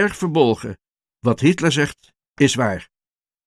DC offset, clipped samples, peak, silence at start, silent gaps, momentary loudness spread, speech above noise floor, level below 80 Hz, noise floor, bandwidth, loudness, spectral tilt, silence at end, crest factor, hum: under 0.1%; under 0.1%; -2 dBFS; 0 s; 2.30-2.34 s; 9 LU; over 72 dB; -52 dBFS; under -90 dBFS; 13 kHz; -19 LUFS; -5 dB/octave; 0.65 s; 18 dB; none